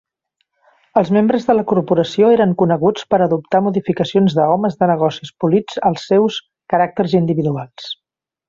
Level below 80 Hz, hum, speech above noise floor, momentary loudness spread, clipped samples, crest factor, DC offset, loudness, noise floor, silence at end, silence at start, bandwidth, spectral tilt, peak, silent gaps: -56 dBFS; none; 55 dB; 7 LU; under 0.1%; 14 dB; under 0.1%; -16 LUFS; -70 dBFS; 0.55 s; 0.95 s; 7.6 kHz; -7.5 dB/octave; -2 dBFS; none